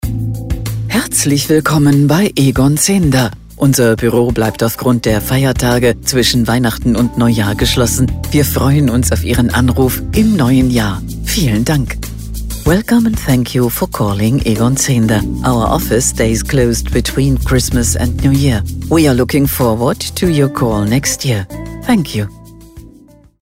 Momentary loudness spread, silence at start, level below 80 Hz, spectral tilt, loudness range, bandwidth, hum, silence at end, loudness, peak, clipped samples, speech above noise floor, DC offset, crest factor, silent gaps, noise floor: 7 LU; 0.05 s; -24 dBFS; -5 dB/octave; 3 LU; 16.5 kHz; none; 0.55 s; -13 LUFS; 0 dBFS; under 0.1%; 30 dB; 0.2%; 12 dB; none; -42 dBFS